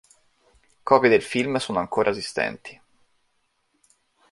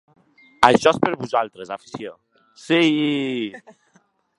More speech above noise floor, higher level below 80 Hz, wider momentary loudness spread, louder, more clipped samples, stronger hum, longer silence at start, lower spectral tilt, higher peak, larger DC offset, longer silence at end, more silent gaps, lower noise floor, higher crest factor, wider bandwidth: first, 48 dB vs 41 dB; second, -62 dBFS vs -56 dBFS; about the same, 19 LU vs 19 LU; second, -22 LUFS vs -19 LUFS; neither; neither; first, 0.85 s vs 0.6 s; about the same, -4.5 dB/octave vs -5 dB/octave; about the same, -2 dBFS vs 0 dBFS; neither; first, 1.6 s vs 0.8 s; neither; first, -70 dBFS vs -61 dBFS; about the same, 24 dB vs 22 dB; about the same, 11.5 kHz vs 11.5 kHz